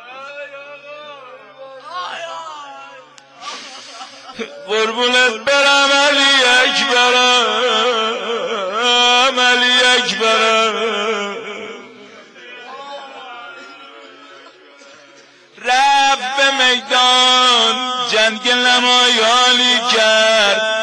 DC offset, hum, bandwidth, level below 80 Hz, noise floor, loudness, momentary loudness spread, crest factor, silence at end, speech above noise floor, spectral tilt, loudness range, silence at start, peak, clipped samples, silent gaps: under 0.1%; none; 11 kHz; -64 dBFS; -45 dBFS; -12 LUFS; 22 LU; 14 dB; 0 s; 31 dB; 0 dB/octave; 19 LU; 0 s; -2 dBFS; under 0.1%; none